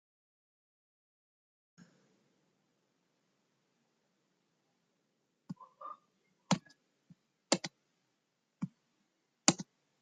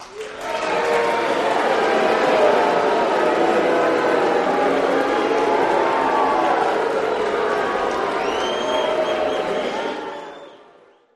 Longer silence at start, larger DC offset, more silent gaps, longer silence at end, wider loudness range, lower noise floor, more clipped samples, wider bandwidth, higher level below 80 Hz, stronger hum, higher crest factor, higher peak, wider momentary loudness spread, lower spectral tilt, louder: first, 5.5 s vs 0 s; neither; neither; second, 0.4 s vs 0.6 s; first, 18 LU vs 4 LU; first, -82 dBFS vs -51 dBFS; neither; second, 9.4 kHz vs 13.5 kHz; second, -82 dBFS vs -56 dBFS; neither; first, 40 dB vs 16 dB; about the same, -4 dBFS vs -4 dBFS; first, 21 LU vs 7 LU; about the same, -3 dB/octave vs -4 dB/octave; second, -35 LUFS vs -19 LUFS